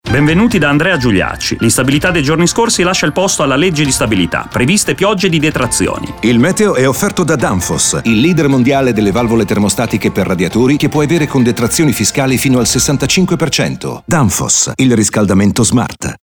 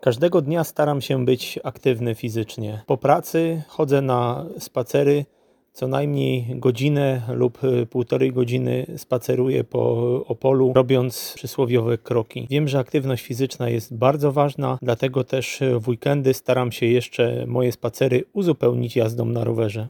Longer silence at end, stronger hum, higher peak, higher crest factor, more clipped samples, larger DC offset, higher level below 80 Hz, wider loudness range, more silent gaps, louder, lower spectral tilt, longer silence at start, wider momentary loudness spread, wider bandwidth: about the same, 0.05 s vs 0 s; neither; about the same, -2 dBFS vs -2 dBFS; second, 10 dB vs 20 dB; neither; neither; first, -34 dBFS vs -62 dBFS; about the same, 1 LU vs 2 LU; neither; first, -11 LUFS vs -22 LUFS; second, -4.5 dB/octave vs -7 dB/octave; about the same, 0.05 s vs 0.05 s; about the same, 4 LU vs 6 LU; about the same, over 20 kHz vs 19 kHz